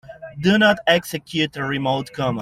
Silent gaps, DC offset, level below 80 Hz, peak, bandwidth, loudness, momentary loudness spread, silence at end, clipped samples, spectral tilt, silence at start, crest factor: none; under 0.1%; -54 dBFS; -2 dBFS; 15.5 kHz; -19 LUFS; 9 LU; 0 s; under 0.1%; -5 dB/octave; 0.1 s; 18 dB